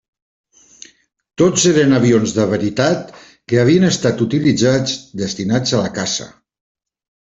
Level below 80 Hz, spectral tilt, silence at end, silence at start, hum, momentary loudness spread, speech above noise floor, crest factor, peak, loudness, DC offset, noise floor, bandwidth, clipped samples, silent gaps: -50 dBFS; -5 dB/octave; 0.95 s; 1.4 s; none; 10 LU; 29 dB; 16 dB; 0 dBFS; -15 LUFS; under 0.1%; -44 dBFS; 8.2 kHz; under 0.1%; none